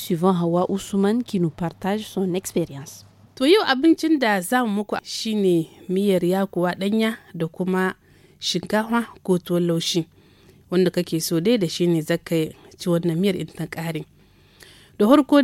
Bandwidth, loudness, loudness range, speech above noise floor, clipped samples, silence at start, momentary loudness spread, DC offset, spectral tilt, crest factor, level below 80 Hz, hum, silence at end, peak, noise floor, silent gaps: 17 kHz; -22 LUFS; 3 LU; 32 dB; under 0.1%; 0 s; 11 LU; under 0.1%; -5.5 dB/octave; 20 dB; -60 dBFS; none; 0 s; -2 dBFS; -53 dBFS; none